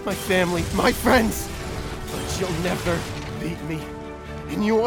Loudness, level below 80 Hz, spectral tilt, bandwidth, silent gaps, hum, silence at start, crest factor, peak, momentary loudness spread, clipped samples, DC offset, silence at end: -24 LUFS; -38 dBFS; -5 dB/octave; over 20 kHz; none; none; 0 s; 20 dB; -4 dBFS; 12 LU; under 0.1%; under 0.1%; 0 s